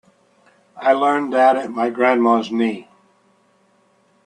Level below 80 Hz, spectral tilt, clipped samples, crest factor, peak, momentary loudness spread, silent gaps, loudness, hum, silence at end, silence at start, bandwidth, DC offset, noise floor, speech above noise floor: -72 dBFS; -5.5 dB/octave; under 0.1%; 18 dB; -2 dBFS; 7 LU; none; -17 LUFS; none; 1.45 s; 0.75 s; 9.8 kHz; under 0.1%; -59 dBFS; 42 dB